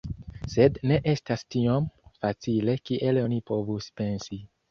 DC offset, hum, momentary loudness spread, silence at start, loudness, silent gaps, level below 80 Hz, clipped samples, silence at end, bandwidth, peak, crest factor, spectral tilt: under 0.1%; none; 12 LU; 0.05 s; -27 LUFS; none; -50 dBFS; under 0.1%; 0.25 s; 7 kHz; -6 dBFS; 20 dB; -7.5 dB/octave